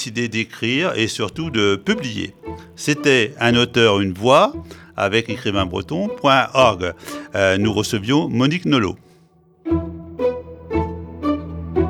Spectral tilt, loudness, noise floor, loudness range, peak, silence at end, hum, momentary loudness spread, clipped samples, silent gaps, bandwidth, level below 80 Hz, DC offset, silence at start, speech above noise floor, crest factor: -5 dB/octave; -19 LUFS; -53 dBFS; 4 LU; 0 dBFS; 0 s; none; 13 LU; under 0.1%; none; 17 kHz; -42 dBFS; under 0.1%; 0 s; 35 dB; 20 dB